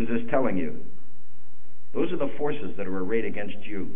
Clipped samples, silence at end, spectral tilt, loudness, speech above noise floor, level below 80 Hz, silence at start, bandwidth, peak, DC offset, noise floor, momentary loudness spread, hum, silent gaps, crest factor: under 0.1%; 0 s; -10 dB/octave; -29 LUFS; 30 dB; -60 dBFS; 0 s; 3.7 kHz; -10 dBFS; 10%; -59 dBFS; 10 LU; none; none; 20 dB